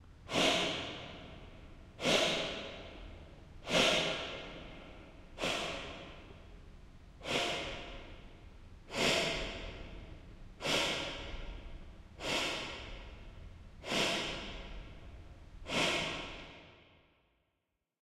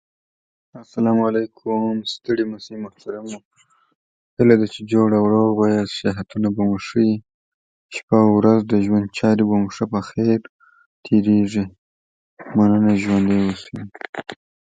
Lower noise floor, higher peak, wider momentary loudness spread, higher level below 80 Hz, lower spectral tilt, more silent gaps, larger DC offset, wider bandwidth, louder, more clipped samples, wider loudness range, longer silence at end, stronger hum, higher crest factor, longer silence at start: second, -85 dBFS vs under -90 dBFS; second, -14 dBFS vs 0 dBFS; first, 25 LU vs 17 LU; about the same, -54 dBFS vs -52 dBFS; second, -2.5 dB/octave vs -7.5 dB/octave; second, none vs 3.45-3.51 s, 3.95-4.37 s, 7.34-7.89 s, 8.03-8.08 s, 10.49-10.59 s, 10.86-11.03 s, 11.78-12.37 s, 14.09-14.13 s; neither; first, 16.5 kHz vs 7.8 kHz; second, -34 LUFS vs -19 LUFS; neither; about the same, 6 LU vs 5 LU; first, 1.2 s vs 0.4 s; neither; first, 24 dB vs 18 dB; second, 0 s vs 0.75 s